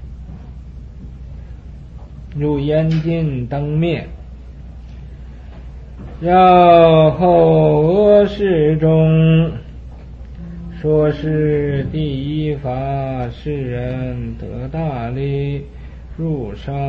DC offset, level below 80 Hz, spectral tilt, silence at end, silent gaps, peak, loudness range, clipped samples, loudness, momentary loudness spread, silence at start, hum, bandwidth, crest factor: under 0.1%; -34 dBFS; -10 dB/octave; 0 s; none; 0 dBFS; 12 LU; under 0.1%; -15 LUFS; 25 LU; 0 s; none; 5.4 kHz; 16 dB